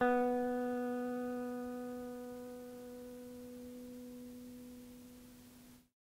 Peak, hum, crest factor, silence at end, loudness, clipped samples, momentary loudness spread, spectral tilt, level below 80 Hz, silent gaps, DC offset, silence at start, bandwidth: -20 dBFS; none; 20 dB; 0.2 s; -42 LUFS; under 0.1%; 20 LU; -5.5 dB/octave; -70 dBFS; none; under 0.1%; 0 s; 16 kHz